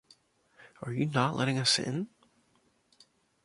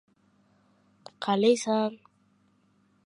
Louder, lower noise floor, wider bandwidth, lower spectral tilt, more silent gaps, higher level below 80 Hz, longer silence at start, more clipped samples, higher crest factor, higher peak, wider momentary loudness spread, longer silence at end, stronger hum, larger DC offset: second, -29 LUFS vs -26 LUFS; about the same, -70 dBFS vs -67 dBFS; about the same, 11.5 kHz vs 11.5 kHz; about the same, -4 dB/octave vs -4.5 dB/octave; neither; first, -70 dBFS vs -82 dBFS; second, 0.8 s vs 1.2 s; neither; about the same, 22 dB vs 20 dB; about the same, -12 dBFS vs -12 dBFS; first, 14 LU vs 10 LU; first, 1.4 s vs 1.1 s; neither; neither